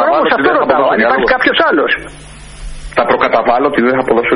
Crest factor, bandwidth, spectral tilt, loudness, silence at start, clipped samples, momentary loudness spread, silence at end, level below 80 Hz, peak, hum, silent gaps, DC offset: 12 dB; 11 kHz; -5 dB/octave; -11 LUFS; 0 s; under 0.1%; 12 LU; 0 s; -34 dBFS; 0 dBFS; none; none; under 0.1%